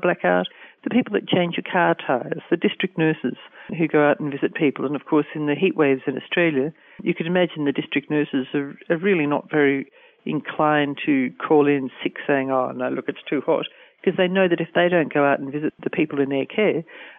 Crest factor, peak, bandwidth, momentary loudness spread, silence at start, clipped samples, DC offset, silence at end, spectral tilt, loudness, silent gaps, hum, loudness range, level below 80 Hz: 16 dB; -6 dBFS; 3.8 kHz; 9 LU; 0 s; under 0.1%; under 0.1%; 0.05 s; -10 dB/octave; -22 LUFS; none; none; 1 LU; -68 dBFS